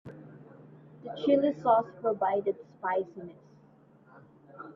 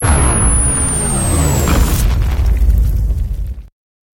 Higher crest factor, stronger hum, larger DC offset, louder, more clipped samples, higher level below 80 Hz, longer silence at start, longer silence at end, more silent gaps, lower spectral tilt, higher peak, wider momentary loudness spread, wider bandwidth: first, 20 dB vs 12 dB; neither; neither; second, -29 LUFS vs -14 LUFS; neither; second, -76 dBFS vs -14 dBFS; about the same, 0.05 s vs 0 s; second, 0.05 s vs 0.5 s; neither; first, -8 dB/octave vs -4.5 dB/octave; second, -12 dBFS vs 0 dBFS; first, 23 LU vs 10 LU; second, 6.2 kHz vs 17 kHz